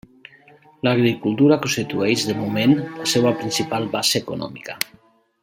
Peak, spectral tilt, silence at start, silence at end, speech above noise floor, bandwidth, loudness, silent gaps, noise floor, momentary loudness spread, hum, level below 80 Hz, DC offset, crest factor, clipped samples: 0 dBFS; -4.5 dB/octave; 0.85 s; 0.6 s; 31 dB; 16.5 kHz; -20 LUFS; none; -50 dBFS; 11 LU; none; -60 dBFS; under 0.1%; 20 dB; under 0.1%